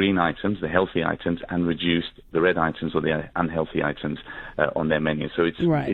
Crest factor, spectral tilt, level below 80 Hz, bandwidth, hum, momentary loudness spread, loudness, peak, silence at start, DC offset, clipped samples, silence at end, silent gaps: 20 dB; -9 dB/octave; -48 dBFS; 4.7 kHz; none; 6 LU; -24 LUFS; -4 dBFS; 0 s; under 0.1%; under 0.1%; 0 s; none